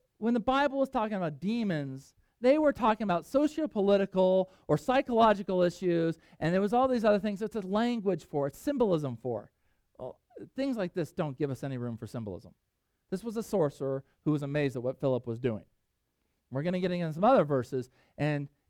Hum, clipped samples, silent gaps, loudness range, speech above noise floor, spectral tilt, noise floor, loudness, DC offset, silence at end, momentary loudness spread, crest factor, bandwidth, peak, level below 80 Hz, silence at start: none; under 0.1%; none; 8 LU; 49 dB; -7.5 dB/octave; -79 dBFS; -30 LUFS; under 0.1%; 0.2 s; 14 LU; 18 dB; 16 kHz; -12 dBFS; -62 dBFS; 0.2 s